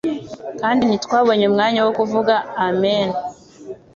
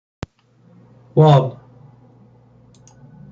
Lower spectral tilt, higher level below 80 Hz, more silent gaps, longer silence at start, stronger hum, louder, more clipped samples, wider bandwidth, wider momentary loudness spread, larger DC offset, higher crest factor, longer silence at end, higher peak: second, -5.5 dB/octave vs -9 dB/octave; about the same, -58 dBFS vs -54 dBFS; neither; second, 0.05 s vs 1.15 s; neither; second, -18 LUFS vs -15 LUFS; neither; about the same, 7.6 kHz vs 7.4 kHz; second, 15 LU vs 25 LU; neither; about the same, 16 dB vs 18 dB; second, 0.2 s vs 1.8 s; about the same, -2 dBFS vs -2 dBFS